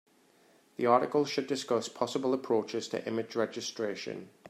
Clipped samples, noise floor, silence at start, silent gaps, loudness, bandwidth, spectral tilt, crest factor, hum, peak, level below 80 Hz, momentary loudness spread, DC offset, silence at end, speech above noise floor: under 0.1%; -64 dBFS; 0.8 s; none; -32 LUFS; 14.5 kHz; -4.5 dB/octave; 22 dB; none; -10 dBFS; -82 dBFS; 9 LU; under 0.1%; 0 s; 33 dB